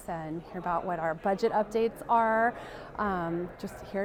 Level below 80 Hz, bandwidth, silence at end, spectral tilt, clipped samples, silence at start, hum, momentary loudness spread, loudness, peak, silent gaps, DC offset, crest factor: -56 dBFS; 16 kHz; 0 s; -6.5 dB/octave; under 0.1%; 0 s; none; 12 LU; -30 LUFS; -14 dBFS; none; under 0.1%; 16 dB